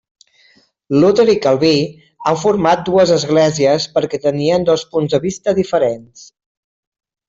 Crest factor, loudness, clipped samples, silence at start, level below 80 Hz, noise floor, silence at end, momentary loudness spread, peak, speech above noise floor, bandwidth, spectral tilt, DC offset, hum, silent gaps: 14 dB; -15 LUFS; under 0.1%; 0.9 s; -52 dBFS; -53 dBFS; 1.05 s; 6 LU; -2 dBFS; 39 dB; 7.8 kHz; -5.5 dB/octave; under 0.1%; none; none